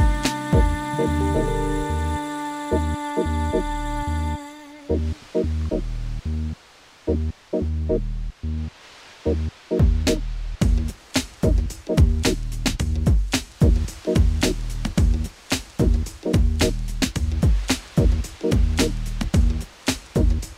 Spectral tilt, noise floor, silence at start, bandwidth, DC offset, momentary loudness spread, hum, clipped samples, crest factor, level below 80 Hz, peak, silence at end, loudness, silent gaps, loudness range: -5.5 dB/octave; -50 dBFS; 0 s; 16 kHz; under 0.1%; 9 LU; none; under 0.1%; 16 dB; -24 dBFS; -4 dBFS; 0.05 s; -24 LUFS; none; 6 LU